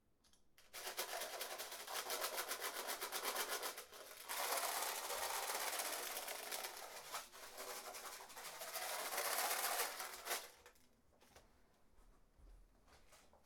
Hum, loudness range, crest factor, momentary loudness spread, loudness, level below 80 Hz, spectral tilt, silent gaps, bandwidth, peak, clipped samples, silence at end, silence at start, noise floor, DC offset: none; 5 LU; 22 dB; 12 LU; -44 LUFS; -76 dBFS; 1 dB/octave; none; over 20 kHz; -24 dBFS; under 0.1%; 0 s; 0.3 s; -72 dBFS; under 0.1%